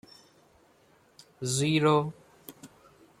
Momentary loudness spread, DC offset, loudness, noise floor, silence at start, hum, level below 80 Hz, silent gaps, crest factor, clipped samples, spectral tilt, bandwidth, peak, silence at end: 25 LU; under 0.1%; -27 LUFS; -63 dBFS; 1.4 s; none; -68 dBFS; none; 20 dB; under 0.1%; -5 dB/octave; 16 kHz; -12 dBFS; 0.55 s